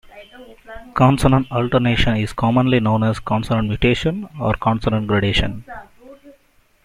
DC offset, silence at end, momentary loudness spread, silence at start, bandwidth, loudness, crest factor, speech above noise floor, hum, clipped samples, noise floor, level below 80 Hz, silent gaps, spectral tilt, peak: under 0.1%; 0.55 s; 12 LU; 0.15 s; 14 kHz; -18 LUFS; 16 dB; 39 dB; none; under 0.1%; -56 dBFS; -34 dBFS; none; -7 dB/octave; -2 dBFS